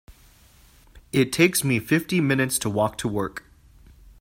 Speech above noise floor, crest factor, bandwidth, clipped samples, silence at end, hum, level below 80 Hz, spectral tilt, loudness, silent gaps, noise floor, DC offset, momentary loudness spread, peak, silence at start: 31 dB; 20 dB; 16.5 kHz; under 0.1%; 0.8 s; none; -52 dBFS; -4.5 dB/octave; -23 LUFS; none; -54 dBFS; under 0.1%; 9 LU; -4 dBFS; 0.1 s